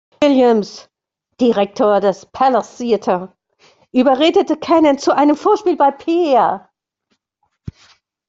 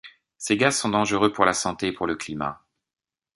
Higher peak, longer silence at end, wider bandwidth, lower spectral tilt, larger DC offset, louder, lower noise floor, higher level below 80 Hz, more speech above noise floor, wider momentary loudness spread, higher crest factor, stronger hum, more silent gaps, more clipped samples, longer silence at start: about the same, -2 dBFS vs -2 dBFS; second, 0.6 s vs 0.8 s; second, 7.8 kHz vs 11.5 kHz; first, -5.5 dB/octave vs -3.5 dB/octave; neither; first, -15 LUFS vs -23 LUFS; second, -69 dBFS vs under -90 dBFS; about the same, -56 dBFS vs -56 dBFS; second, 55 dB vs over 67 dB; about the same, 8 LU vs 10 LU; second, 14 dB vs 24 dB; neither; neither; neither; first, 0.2 s vs 0.05 s